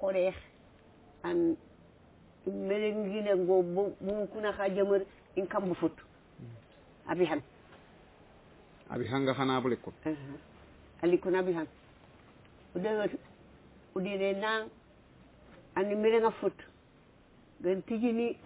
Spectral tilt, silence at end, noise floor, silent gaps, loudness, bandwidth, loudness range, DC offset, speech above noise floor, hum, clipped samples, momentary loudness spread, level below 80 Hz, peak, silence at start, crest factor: -5 dB/octave; 0 s; -61 dBFS; none; -32 LUFS; 4 kHz; 5 LU; under 0.1%; 29 dB; none; under 0.1%; 14 LU; -64 dBFS; -16 dBFS; 0 s; 18 dB